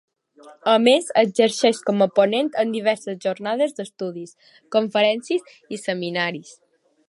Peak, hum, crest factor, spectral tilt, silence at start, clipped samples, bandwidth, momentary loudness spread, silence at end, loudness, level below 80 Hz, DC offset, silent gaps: -2 dBFS; none; 20 dB; -4 dB/octave; 0.45 s; under 0.1%; 11.5 kHz; 13 LU; 0.6 s; -21 LUFS; -78 dBFS; under 0.1%; none